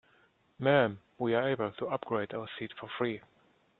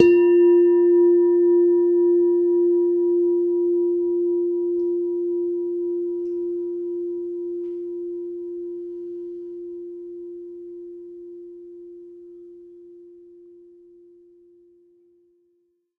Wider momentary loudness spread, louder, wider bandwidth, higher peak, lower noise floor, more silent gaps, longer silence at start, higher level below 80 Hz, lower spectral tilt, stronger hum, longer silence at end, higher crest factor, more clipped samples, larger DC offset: second, 14 LU vs 23 LU; second, -32 LUFS vs -20 LUFS; first, 4.3 kHz vs 2.9 kHz; second, -10 dBFS vs 0 dBFS; about the same, -68 dBFS vs -68 dBFS; neither; first, 0.6 s vs 0 s; second, -72 dBFS vs -66 dBFS; about the same, -9 dB/octave vs -8 dB/octave; neither; second, 0.6 s vs 2.9 s; about the same, 22 dB vs 22 dB; neither; neither